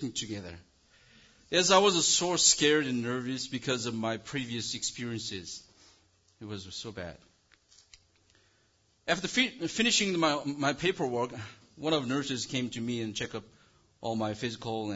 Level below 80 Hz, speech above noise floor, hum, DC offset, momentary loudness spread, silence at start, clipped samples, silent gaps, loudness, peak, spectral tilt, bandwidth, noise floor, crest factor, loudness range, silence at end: -64 dBFS; 39 dB; none; under 0.1%; 19 LU; 0 s; under 0.1%; none; -29 LUFS; -8 dBFS; -2.5 dB/octave; 8 kHz; -69 dBFS; 24 dB; 16 LU; 0 s